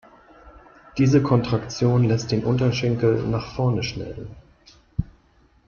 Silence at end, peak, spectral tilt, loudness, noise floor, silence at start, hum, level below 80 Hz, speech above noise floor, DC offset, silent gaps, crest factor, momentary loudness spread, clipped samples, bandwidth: 0.6 s; -6 dBFS; -7 dB/octave; -22 LUFS; -58 dBFS; 0.45 s; none; -44 dBFS; 37 dB; under 0.1%; none; 16 dB; 15 LU; under 0.1%; 7.2 kHz